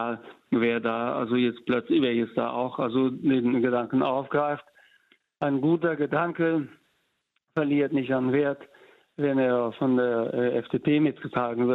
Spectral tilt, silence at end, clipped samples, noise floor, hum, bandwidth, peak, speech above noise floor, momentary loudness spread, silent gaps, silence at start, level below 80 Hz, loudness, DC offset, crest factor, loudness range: -9 dB/octave; 0 s; under 0.1%; -75 dBFS; none; 4.4 kHz; -12 dBFS; 50 dB; 6 LU; none; 0 s; -68 dBFS; -26 LUFS; under 0.1%; 14 dB; 2 LU